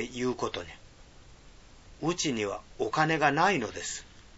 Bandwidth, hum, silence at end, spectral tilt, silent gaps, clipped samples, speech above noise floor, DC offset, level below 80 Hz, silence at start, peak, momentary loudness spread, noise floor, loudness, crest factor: 8 kHz; none; 0.1 s; -4 dB/octave; none; under 0.1%; 23 dB; under 0.1%; -56 dBFS; 0 s; -8 dBFS; 13 LU; -53 dBFS; -29 LUFS; 24 dB